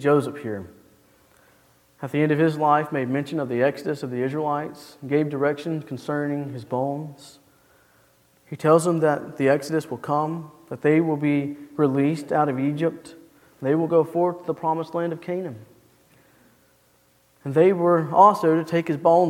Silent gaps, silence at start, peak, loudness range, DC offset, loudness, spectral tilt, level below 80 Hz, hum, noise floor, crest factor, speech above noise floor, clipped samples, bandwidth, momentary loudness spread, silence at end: none; 0 s; -2 dBFS; 6 LU; under 0.1%; -23 LUFS; -7.5 dB/octave; -70 dBFS; none; -61 dBFS; 22 dB; 39 dB; under 0.1%; 16 kHz; 13 LU; 0 s